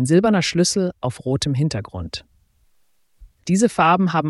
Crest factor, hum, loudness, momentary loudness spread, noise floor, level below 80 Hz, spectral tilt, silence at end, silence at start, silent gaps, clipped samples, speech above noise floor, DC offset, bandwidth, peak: 16 dB; none; -19 LUFS; 15 LU; -66 dBFS; -48 dBFS; -5 dB/octave; 0 s; 0 s; none; under 0.1%; 47 dB; under 0.1%; 12 kHz; -4 dBFS